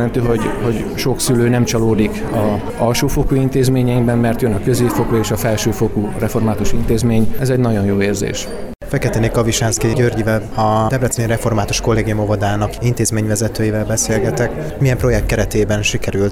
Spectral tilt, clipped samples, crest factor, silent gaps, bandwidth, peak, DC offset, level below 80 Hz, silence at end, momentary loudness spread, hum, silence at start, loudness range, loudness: -5.5 dB/octave; under 0.1%; 12 dB; none; 20 kHz; -4 dBFS; under 0.1%; -28 dBFS; 0 s; 4 LU; none; 0 s; 1 LU; -16 LUFS